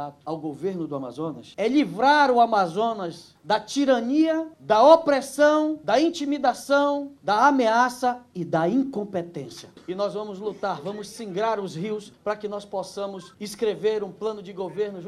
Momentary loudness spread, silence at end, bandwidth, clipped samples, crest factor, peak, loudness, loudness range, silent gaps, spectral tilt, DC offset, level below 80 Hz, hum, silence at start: 15 LU; 0 s; 13.5 kHz; under 0.1%; 20 dB; -2 dBFS; -23 LUFS; 10 LU; none; -5 dB/octave; under 0.1%; -66 dBFS; none; 0 s